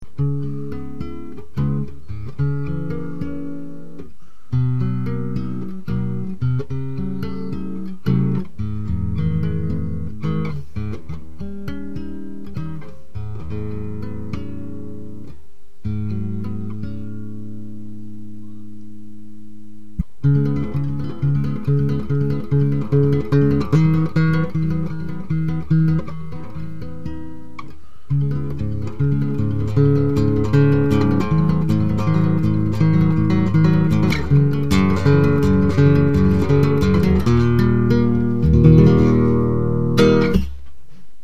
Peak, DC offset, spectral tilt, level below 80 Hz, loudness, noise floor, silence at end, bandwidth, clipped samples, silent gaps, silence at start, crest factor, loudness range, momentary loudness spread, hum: 0 dBFS; 5%; -9 dB/octave; -34 dBFS; -19 LUFS; -44 dBFS; 0 s; 7.8 kHz; under 0.1%; none; 0 s; 20 dB; 15 LU; 18 LU; none